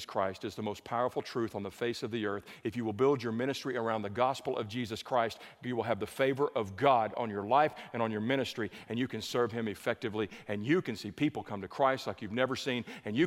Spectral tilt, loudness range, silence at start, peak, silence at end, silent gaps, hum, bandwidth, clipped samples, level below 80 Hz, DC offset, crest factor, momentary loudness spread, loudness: -5.5 dB/octave; 3 LU; 0 s; -12 dBFS; 0 s; none; none; 16 kHz; under 0.1%; -72 dBFS; under 0.1%; 22 dB; 8 LU; -33 LUFS